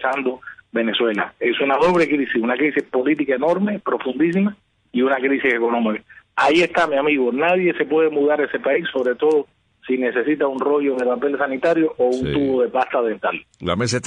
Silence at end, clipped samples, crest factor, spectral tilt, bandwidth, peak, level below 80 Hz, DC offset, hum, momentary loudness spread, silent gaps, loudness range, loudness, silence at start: 0 s; under 0.1%; 14 dB; -5.5 dB/octave; 10 kHz; -6 dBFS; -54 dBFS; under 0.1%; none; 7 LU; none; 2 LU; -19 LUFS; 0 s